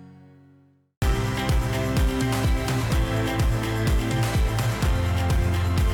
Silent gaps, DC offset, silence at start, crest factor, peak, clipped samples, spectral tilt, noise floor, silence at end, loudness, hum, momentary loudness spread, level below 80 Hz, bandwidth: 0.97-1.01 s; under 0.1%; 0 s; 10 dB; -14 dBFS; under 0.1%; -5.5 dB/octave; -57 dBFS; 0 s; -24 LUFS; none; 1 LU; -28 dBFS; 18.5 kHz